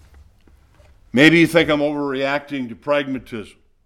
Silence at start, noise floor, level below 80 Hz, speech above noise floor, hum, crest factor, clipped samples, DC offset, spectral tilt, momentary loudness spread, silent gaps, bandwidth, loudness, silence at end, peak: 1.15 s; -52 dBFS; -50 dBFS; 34 dB; none; 20 dB; under 0.1%; under 0.1%; -5.5 dB/octave; 17 LU; none; 14.5 kHz; -17 LUFS; 0.4 s; 0 dBFS